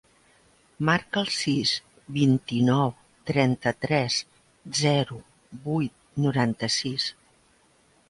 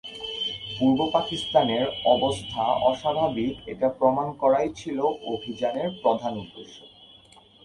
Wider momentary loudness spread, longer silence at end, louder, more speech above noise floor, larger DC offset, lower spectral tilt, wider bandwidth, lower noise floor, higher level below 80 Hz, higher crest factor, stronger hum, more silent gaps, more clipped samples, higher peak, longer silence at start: about the same, 9 LU vs 10 LU; first, 1 s vs 0.6 s; about the same, -25 LUFS vs -25 LUFS; first, 37 dB vs 29 dB; neither; about the same, -5 dB/octave vs -5.5 dB/octave; about the same, 11.5 kHz vs 11.5 kHz; first, -62 dBFS vs -53 dBFS; about the same, -60 dBFS vs -56 dBFS; about the same, 20 dB vs 20 dB; neither; neither; neither; about the same, -8 dBFS vs -6 dBFS; first, 0.8 s vs 0.05 s